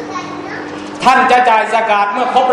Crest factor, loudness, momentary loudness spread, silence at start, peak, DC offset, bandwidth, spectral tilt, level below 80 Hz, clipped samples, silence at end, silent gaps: 12 dB; -11 LUFS; 15 LU; 0 s; 0 dBFS; under 0.1%; 11 kHz; -3.5 dB/octave; -52 dBFS; 0.2%; 0 s; none